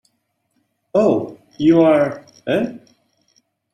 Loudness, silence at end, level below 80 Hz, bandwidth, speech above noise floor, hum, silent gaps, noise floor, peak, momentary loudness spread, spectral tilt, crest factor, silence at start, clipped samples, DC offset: -17 LUFS; 0.95 s; -58 dBFS; 9.4 kHz; 54 dB; none; none; -69 dBFS; -2 dBFS; 14 LU; -7.5 dB/octave; 16 dB; 0.95 s; under 0.1%; under 0.1%